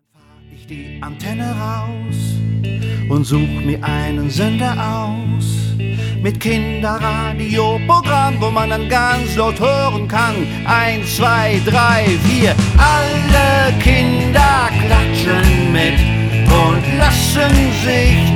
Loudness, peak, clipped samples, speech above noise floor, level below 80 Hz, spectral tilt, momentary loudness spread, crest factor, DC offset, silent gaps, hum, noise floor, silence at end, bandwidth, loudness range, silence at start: -14 LUFS; 0 dBFS; under 0.1%; 32 dB; -22 dBFS; -5.5 dB/octave; 9 LU; 14 dB; under 0.1%; none; none; -45 dBFS; 0 s; 17 kHz; 6 LU; 0.7 s